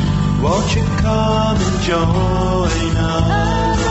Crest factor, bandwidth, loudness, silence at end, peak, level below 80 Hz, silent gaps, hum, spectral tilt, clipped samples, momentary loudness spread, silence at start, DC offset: 12 dB; 8.2 kHz; -16 LUFS; 0 s; -4 dBFS; -24 dBFS; none; none; -6 dB/octave; under 0.1%; 2 LU; 0 s; under 0.1%